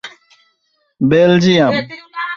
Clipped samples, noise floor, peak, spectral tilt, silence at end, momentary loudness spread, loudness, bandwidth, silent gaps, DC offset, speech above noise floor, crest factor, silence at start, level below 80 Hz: under 0.1%; -64 dBFS; -2 dBFS; -6.5 dB/octave; 0 s; 17 LU; -13 LUFS; 7.4 kHz; none; under 0.1%; 52 dB; 14 dB; 0.05 s; -52 dBFS